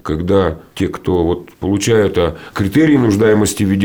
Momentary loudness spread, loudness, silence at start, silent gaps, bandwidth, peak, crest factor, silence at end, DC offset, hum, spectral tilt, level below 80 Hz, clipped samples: 9 LU; -15 LUFS; 0.05 s; none; over 20 kHz; -2 dBFS; 12 dB; 0 s; 0.5%; none; -6 dB/octave; -40 dBFS; under 0.1%